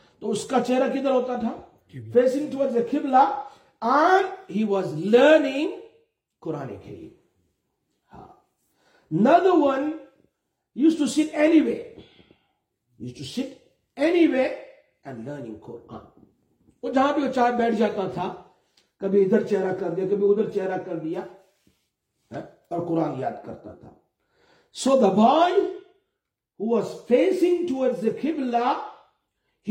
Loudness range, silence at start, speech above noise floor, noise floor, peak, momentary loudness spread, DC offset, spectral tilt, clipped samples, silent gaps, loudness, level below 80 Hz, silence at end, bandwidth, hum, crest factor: 7 LU; 0.2 s; 60 dB; -82 dBFS; -4 dBFS; 22 LU; under 0.1%; -6 dB/octave; under 0.1%; none; -23 LUFS; -68 dBFS; 0 s; 12 kHz; none; 20 dB